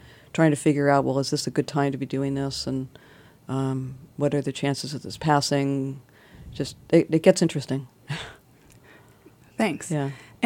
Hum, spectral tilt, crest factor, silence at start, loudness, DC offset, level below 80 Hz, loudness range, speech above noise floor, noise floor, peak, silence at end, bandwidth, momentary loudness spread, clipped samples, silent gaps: none; -5.5 dB/octave; 22 dB; 0.05 s; -25 LUFS; under 0.1%; -58 dBFS; 4 LU; 30 dB; -54 dBFS; -2 dBFS; 0 s; 16.5 kHz; 14 LU; under 0.1%; none